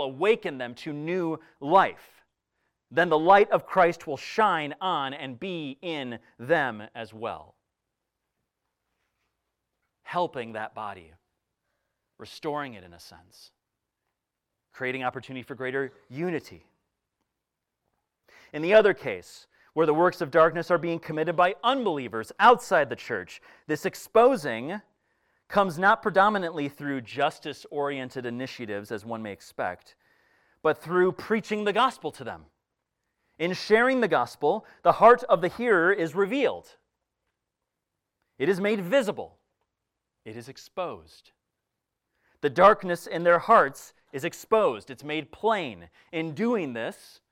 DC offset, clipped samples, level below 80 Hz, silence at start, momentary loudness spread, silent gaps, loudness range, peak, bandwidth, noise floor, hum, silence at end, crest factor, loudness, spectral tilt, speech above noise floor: under 0.1%; under 0.1%; -68 dBFS; 0 s; 18 LU; none; 14 LU; -6 dBFS; 16.5 kHz; -85 dBFS; none; 0.35 s; 22 dB; -25 LUFS; -5.5 dB/octave; 59 dB